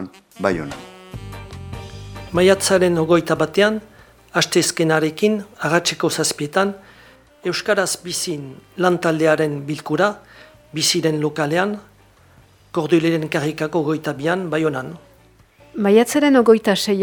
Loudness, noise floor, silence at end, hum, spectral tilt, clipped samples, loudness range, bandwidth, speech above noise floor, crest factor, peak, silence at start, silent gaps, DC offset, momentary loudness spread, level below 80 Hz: -18 LUFS; -51 dBFS; 0 s; none; -4.5 dB/octave; under 0.1%; 4 LU; over 20 kHz; 33 dB; 20 dB; 0 dBFS; 0 s; none; under 0.1%; 19 LU; -50 dBFS